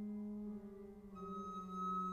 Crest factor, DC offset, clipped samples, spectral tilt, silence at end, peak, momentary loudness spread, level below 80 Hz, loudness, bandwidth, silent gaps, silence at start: 12 dB; under 0.1%; under 0.1%; -8 dB/octave; 0 s; -34 dBFS; 12 LU; -68 dBFS; -47 LUFS; 9.4 kHz; none; 0 s